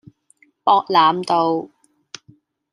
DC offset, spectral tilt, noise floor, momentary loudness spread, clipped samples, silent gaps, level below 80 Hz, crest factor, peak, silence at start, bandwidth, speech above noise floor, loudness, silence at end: under 0.1%; -5 dB/octave; -58 dBFS; 24 LU; under 0.1%; none; -72 dBFS; 18 dB; -2 dBFS; 0.65 s; 11 kHz; 42 dB; -17 LUFS; 1.05 s